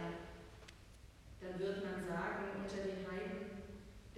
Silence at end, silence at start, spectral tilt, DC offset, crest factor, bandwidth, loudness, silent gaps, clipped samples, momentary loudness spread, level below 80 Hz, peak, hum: 0 s; 0 s; -6 dB/octave; under 0.1%; 16 dB; 14.5 kHz; -44 LUFS; none; under 0.1%; 17 LU; -62 dBFS; -28 dBFS; none